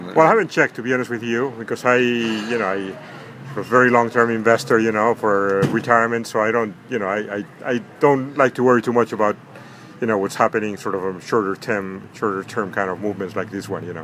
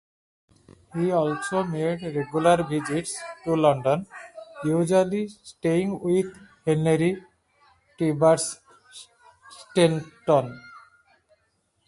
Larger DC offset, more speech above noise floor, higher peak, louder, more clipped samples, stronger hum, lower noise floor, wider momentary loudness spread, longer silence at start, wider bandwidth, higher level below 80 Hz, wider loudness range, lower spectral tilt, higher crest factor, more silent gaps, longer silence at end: neither; second, 21 dB vs 47 dB; first, 0 dBFS vs -6 dBFS; first, -19 LUFS vs -24 LUFS; neither; neither; second, -40 dBFS vs -71 dBFS; second, 11 LU vs 15 LU; second, 0 s vs 0.95 s; first, 15.5 kHz vs 11.5 kHz; about the same, -64 dBFS vs -62 dBFS; first, 5 LU vs 2 LU; about the same, -5.5 dB/octave vs -6 dB/octave; about the same, 20 dB vs 20 dB; neither; second, 0 s vs 1.1 s